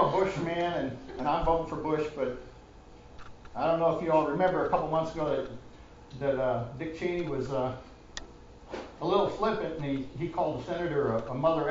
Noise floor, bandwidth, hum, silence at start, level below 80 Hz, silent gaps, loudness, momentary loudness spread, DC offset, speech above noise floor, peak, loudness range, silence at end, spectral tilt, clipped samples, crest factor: -51 dBFS; 7.8 kHz; none; 0 s; -50 dBFS; none; -30 LUFS; 17 LU; under 0.1%; 22 dB; -12 dBFS; 4 LU; 0 s; -7 dB/octave; under 0.1%; 18 dB